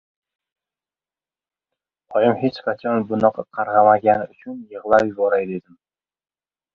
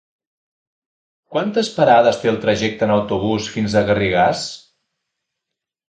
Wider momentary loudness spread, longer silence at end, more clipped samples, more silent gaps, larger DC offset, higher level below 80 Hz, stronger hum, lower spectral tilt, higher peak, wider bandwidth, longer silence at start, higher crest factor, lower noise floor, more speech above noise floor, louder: first, 17 LU vs 11 LU; second, 1.15 s vs 1.3 s; neither; neither; neither; second, -60 dBFS vs -48 dBFS; neither; first, -8 dB/octave vs -5.5 dB/octave; about the same, -2 dBFS vs 0 dBFS; second, 7.2 kHz vs 9.2 kHz; first, 2.1 s vs 1.3 s; about the same, 20 dB vs 20 dB; first, under -90 dBFS vs -82 dBFS; first, over 71 dB vs 66 dB; about the same, -19 LUFS vs -17 LUFS